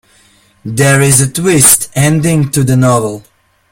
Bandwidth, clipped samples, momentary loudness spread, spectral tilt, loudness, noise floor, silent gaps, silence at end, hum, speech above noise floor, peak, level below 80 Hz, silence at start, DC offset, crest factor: over 20 kHz; 0.5%; 15 LU; -4.5 dB/octave; -9 LUFS; -48 dBFS; none; 0.5 s; none; 38 dB; 0 dBFS; -40 dBFS; 0.65 s; under 0.1%; 10 dB